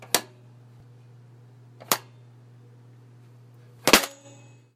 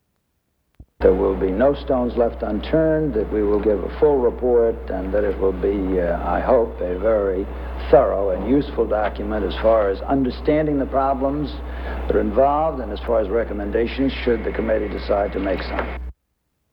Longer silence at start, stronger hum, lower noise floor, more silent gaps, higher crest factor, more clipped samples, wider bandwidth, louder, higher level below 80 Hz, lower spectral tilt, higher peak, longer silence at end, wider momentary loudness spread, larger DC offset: second, 0.15 s vs 0.8 s; neither; second, -51 dBFS vs -71 dBFS; neither; first, 30 dB vs 20 dB; neither; about the same, 16.5 kHz vs 17 kHz; second, -23 LUFS vs -20 LUFS; second, -58 dBFS vs -32 dBFS; second, -1.5 dB/octave vs -9.5 dB/octave; about the same, 0 dBFS vs 0 dBFS; about the same, 0.65 s vs 0.6 s; first, 15 LU vs 8 LU; neither